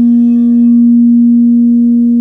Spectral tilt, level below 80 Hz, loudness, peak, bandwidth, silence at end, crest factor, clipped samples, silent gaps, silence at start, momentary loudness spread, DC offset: -11.5 dB/octave; -58 dBFS; -7 LUFS; -2 dBFS; 1.2 kHz; 0 s; 4 dB; under 0.1%; none; 0 s; 2 LU; 0.3%